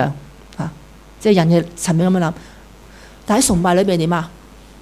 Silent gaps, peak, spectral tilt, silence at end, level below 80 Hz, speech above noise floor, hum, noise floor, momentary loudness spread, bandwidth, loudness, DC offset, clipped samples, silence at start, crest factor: none; -2 dBFS; -5.5 dB/octave; 0.5 s; -40 dBFS; 26 dB; none; -41 dBFS; 20 LU; 15 kHz; -17 LUFS; under 0.1%; under 0.1%; 0 s; 16 dB